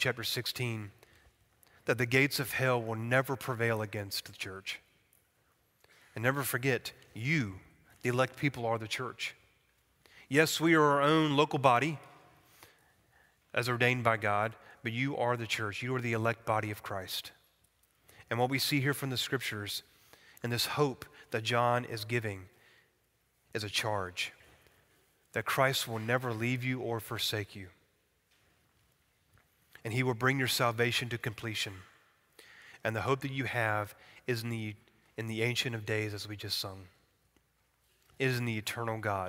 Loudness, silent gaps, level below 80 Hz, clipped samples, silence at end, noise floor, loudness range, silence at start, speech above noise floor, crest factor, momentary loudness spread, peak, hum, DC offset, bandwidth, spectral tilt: -32 LUFS; none; -70 dBFS; under 0.1%; 0 s; -74 dBFS; 7 LU; 0 s; 42 dB; 24 dB; 13 LU; -10 dBFS; none; under 0.1%; 16 kHz; -4.5 dB/octave